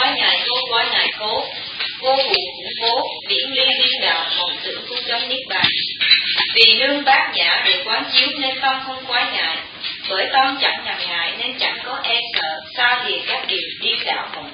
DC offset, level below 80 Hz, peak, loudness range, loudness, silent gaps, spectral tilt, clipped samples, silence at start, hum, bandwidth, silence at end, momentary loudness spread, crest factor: under 0.1%; -60 dBFS; 0 dBFS; 5 LU; -17 LUFS; none; -3.5 dB/octave; under 0.1%; 0 s; none; 8 kHz; 0 s; 9 LU; 20 dB